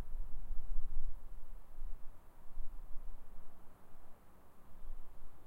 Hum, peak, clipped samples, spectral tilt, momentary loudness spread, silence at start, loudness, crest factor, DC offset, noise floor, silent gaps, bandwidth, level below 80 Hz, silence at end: none; -18 dBFS; under 0.1%; -7 dB/octave; 16 LU; 0 s; -54 LUFS; 14 dB; under 0.1%; -53 dBFS; none; 1.5 kHz; -42 dBFS; 0.05 s